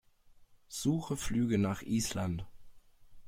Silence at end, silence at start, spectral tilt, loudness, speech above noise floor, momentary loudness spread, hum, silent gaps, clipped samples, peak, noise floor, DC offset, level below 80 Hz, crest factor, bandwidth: 0 s; 0.3 s; -5.5 dB/octave; -34 LUFS; 28 dB; 11 LU; none; none; under 0.1%; -18 dBFS; -61 dBFS; under 0.1%; -52 dBFS; 16 dB; 16.5 kHz